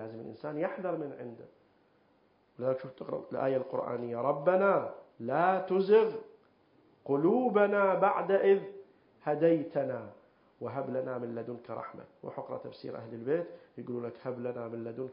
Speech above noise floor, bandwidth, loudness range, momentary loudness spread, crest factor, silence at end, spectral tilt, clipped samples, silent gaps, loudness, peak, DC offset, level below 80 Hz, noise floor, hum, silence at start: 37 dB; 5.4 kHz; 11 LU; 17 LU; 20 dB; 0 s; -10.5 dB/octave; under 0.1%; none; -31 LUFS; -12 dBFS; under 0.1%; -80 dBFS; -68 dBFS; none; 0 s